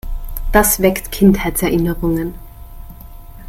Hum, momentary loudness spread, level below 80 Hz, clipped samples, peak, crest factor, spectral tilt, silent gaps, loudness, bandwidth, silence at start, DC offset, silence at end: none; 13 LU; -26 dBFS; under 0.1%; 0 dBFS; 16 dB; -5 dB/octave; none; -15 LUFS; 16.5 kHz; 0.05 s; under 0.1%; 0 s